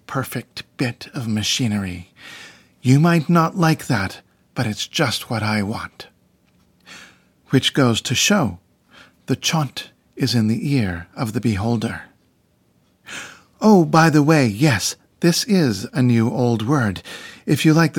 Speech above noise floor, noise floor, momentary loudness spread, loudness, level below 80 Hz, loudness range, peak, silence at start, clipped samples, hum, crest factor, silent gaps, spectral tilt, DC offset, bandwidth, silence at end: 42 dB; -61 dBFS; 18 LU; -19 LUFS; -60 dBFS; 6 LU; 0 dBFS; 0.1 s; under 0.1%; none; 20 dB; none; -5 dB/octave; under 0.1%; 17.5 kHz; 0 s